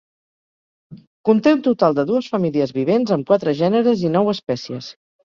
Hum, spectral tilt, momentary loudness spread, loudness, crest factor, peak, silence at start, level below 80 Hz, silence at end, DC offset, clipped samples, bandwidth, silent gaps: none; -7.5 dB/octave; 9 LU; -18 LUFS; 16 dB; -2 dBFS; 0.9 s; -62 dBFS; 0.35 s; under 0.1%; under 0.1%; 7.4 kHz; 1.07-1.24 s